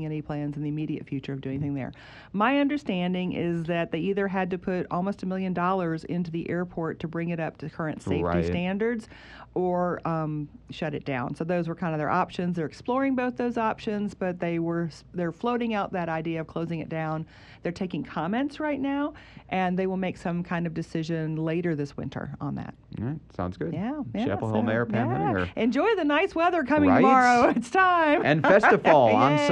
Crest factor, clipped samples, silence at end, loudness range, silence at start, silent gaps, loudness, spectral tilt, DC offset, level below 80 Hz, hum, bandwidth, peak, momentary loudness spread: 20 dB; under 0.1%; 0 s; 9 LU; 0 s; none; -26 LUFS; -7 dB/octave; under 0.1%; -56 dBFS; none; 10 kHz; -6 dBFS; 14 LU